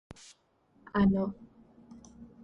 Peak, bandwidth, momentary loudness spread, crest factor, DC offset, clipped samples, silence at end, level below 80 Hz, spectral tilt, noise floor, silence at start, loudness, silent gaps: -16 dBFS; 8.2 kHz; 26 LU; 18 dB; under 0.1%; under 0.1%; 0.2 s; -54 dBFS; -8 dB/octave; -68 dBFS; 0.95 s; -29 LUFS; none